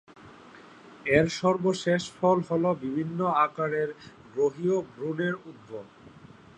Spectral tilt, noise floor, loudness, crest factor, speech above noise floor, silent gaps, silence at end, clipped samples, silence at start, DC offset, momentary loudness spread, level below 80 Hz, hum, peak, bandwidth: -6 dB/octave; -50 dBFS; -27 LUFS; 20 dB; 23 dB; none; 0.5 s; under 0.1%; 0.25 s; under 0.1%; 15 LU; -62 dBFS; none; -8 dBFS; 10 kHz